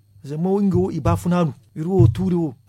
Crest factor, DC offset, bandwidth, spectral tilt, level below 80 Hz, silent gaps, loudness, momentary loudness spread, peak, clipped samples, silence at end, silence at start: 16 dB; under 0.1%; 13 kHz; -9 dB/octave; -40 dBFS; none; -20 LUFS; 9 LU; -2 dBFS; under 0.1%; 0.15 s; 0.25 s